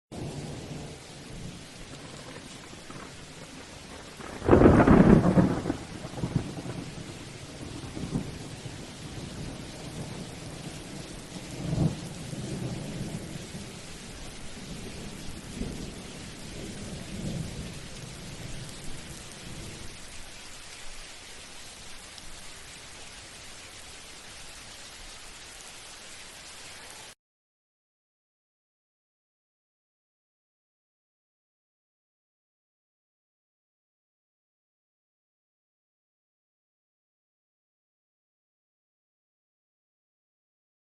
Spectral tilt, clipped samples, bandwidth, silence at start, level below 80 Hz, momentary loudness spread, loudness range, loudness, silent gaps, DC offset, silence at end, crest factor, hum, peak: -6 dB/octave; under 0.1%; 12.5 kHz; 0.1 s; -46 dBFS; 14 LU; 20 LU; -30 LUFS; none; under 0.1%; 13.7 s; 30 dB; none; -4 dBFS